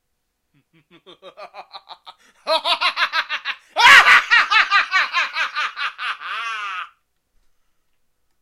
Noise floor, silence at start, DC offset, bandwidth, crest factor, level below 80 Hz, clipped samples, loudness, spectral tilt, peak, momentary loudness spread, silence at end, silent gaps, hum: -72 dBFS; 1.25 s; under 0.1%; 16 kHz; 20 dB; -60 dBFS; under 0.1%; -15 LUFS; 1 dB/octave; 0 dBFS; 18 LU; 1.55 s; none; none